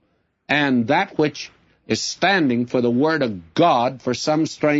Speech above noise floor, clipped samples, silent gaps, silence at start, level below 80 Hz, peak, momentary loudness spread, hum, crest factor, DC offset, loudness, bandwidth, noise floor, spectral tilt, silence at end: 28 dB; under 0.1%; none; 0.5 s; -62 dBFS; -4 dBFS; 7 LU; none; 16 dB; under 0.1%; -20 LUFS; 8 kHz; -47 dBFS; -5 dB/octave; 0 s